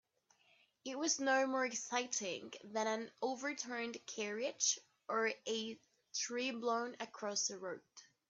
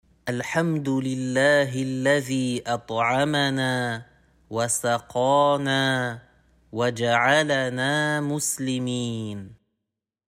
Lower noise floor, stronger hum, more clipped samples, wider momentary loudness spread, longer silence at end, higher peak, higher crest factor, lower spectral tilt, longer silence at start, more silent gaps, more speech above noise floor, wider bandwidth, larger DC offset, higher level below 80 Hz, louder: second, -74 dBFS vs -84 dBFS; neither; neither; about the same, 12 LU vs 11 LU; second, 0.25 s vs 0.75 s; second, -20 dBFS vs -6 dBFS; about the same, 20 dB vs 18 dB; second, -1 dB/octave vs -4 dB/octave; first, 0.85 s vs 0.25 s; neither; second, 34 dB vs 60 dB; second, 8.4 kHz vs 16 kHz; neither; second, under -90 dBFS vs -62 dBFS; second, -39 LUFS vs -23 LUFS